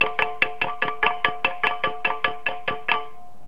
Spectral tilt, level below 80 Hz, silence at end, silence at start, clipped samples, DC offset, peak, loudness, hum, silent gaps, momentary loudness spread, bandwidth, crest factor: -4 dB/octave; -58 dBFS; 0.2 s; 0 s; under 0.1%; 3%; -2 dBFS; -24 LUFS; none; none; 5 LU; 16.5 kHz; 22 dB